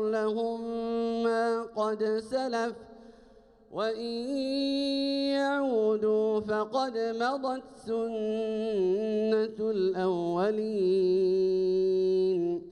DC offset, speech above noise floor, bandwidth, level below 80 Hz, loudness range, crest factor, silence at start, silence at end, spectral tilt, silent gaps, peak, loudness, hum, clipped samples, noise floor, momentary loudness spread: under 0.1%; 29 dB; 10.5 kHz; -66 dBFS; 5 LU; 14 dB; 0 s; 0 s; -6 dB/octave; none; -16 dBFS; -29 LUFS; none; under 0.1%; -57 dBFS; 7 LU